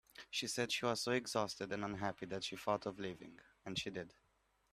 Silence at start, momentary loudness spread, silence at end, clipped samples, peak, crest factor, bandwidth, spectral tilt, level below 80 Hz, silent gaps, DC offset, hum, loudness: 0.15 s; 13 LU; 0.6 s; under 0.1%; -22 dBFS; 22 dB; 15.5 kHz; -3.5 dB/octave; -74 dBFS; none; under 0.1%; none; -41 LUFS